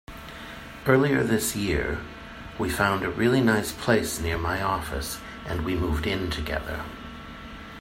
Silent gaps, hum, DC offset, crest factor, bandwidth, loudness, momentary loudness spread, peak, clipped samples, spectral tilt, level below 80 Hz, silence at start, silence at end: none; none; under 0.1%; 20 dB; 16 kHz; -26 LUFS; 18 LU; -6 dBFS; under 0.1%; -5 dB/octave; -40 dBFS; 0.1 s; 0 s